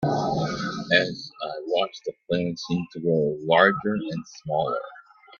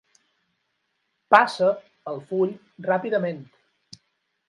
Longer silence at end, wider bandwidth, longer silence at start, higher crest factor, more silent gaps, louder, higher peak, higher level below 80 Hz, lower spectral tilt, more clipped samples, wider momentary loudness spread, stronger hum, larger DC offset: second, 0.4 s vs 1.05 s; second, 7.2 kHz vs 11.5 kHz; second, 0 s vs 1.3 s; about the same, 22 dB vs 26 dB; neither; about the same, -25 LUFS vs -23 LUFS; about the same, -2 dBFS vs 0 dBFS; first, -60 dBFS vs -78 dBFS; about the same, -5.5 dB/octave vs -6 dB/octave; neither; second, 14 LU vs 17 LU; neither; neither